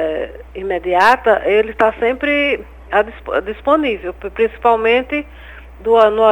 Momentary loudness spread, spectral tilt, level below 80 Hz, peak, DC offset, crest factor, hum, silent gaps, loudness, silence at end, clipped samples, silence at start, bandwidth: 12 LU; -5 dB/octave; -40 dBFS; 0 dBFS; 0.1%; 16 dB; none; none; -16 LUFS; 0 s; under 0.1%; 0 s; 18 kHz